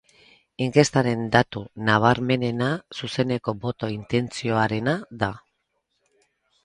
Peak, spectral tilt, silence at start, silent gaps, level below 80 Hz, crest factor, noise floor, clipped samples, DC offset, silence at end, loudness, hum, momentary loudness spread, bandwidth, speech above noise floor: -2 dBFS; -5.5 dB/octave; 0.6 s; none; -54 dBFS; 24 dB; -74 dBFS; under 0.1%; under 0.1%; 1.25 s; -23 LUFS; none; 10 LU; 11 kHz; 52 dB